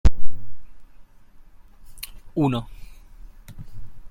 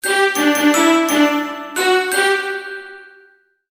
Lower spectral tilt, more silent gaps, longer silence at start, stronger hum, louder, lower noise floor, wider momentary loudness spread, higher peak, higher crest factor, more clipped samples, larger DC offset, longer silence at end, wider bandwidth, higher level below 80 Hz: first, -7 dB/octave vs -1 dB/octave; neither; about the same, 0.05 s vs 0.05 s; neither; second, -27 LUFS vs -15 LUFS; second, -46 dBFS vs -53 dBFS; first, 27 LU vs 14 LU; about the same, -2 dBFS vs -2 dBFS; about the same, 16 dB vs 16 dB; neither; neither; second, 0.05 s vs 0.65 s; about the same, 15.5 kHz vs 16 kHz; first, -32 dBFS vs -66 dBFS